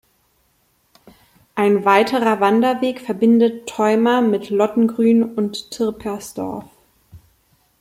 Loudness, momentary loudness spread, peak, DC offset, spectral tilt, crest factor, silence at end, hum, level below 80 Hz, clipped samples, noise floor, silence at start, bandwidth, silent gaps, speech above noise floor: -18 LUFS; 13 LU; -2 dBFS; under 0.1%; -5.5 dB/octave; 18 dB; 0.65 s; none; -58 dBFS; under 0.1%; -62 dBFS; 1.55 s; 15.5 kHz; none; 45 dB